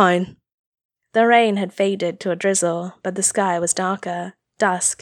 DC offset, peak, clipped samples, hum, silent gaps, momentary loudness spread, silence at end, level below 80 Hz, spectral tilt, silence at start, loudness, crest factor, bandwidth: under 0.1%; -2 dBFS; under 0.1%; none; 0.54-0.72 s, 0.85-0.89 s; 12 LU; 0.1 s; -66 dBFS; -3.5 dB/octave; 0 s; -20 LUFS; 20 dB; 16 kHz